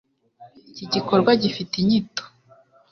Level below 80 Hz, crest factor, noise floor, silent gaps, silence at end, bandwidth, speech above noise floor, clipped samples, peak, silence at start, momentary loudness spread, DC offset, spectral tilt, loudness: -60 dBFS; 20 dB; -55 dBFS; none; 0.65 s; 6.6 kHz; 35 dB; under 0.1%; -4 dBFS; 0.4 s; 17 LU; under 0.1%; -6 dB/octave; -21 LUFS